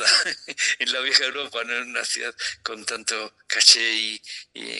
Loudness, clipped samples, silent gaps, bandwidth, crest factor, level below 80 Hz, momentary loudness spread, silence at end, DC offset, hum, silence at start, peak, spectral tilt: -21 LUFS; under 0.1%; none; 13 kHz; 24 dB; -74 dBFS; 15 LU; 0 s; under 0.1%; none; 0 s; 0 dBFS; 2 dB/octave